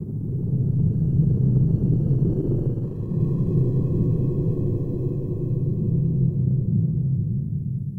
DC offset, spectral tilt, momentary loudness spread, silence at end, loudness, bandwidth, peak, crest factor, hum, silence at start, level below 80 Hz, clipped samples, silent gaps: under 0.1%; -13.5 dB/octave; 6 LU; 0 s; -23 LUFS; 1.2 kHz; -8 dBFS; 12 dB; none; 0 s; -36 dBFS; under 0.1%; none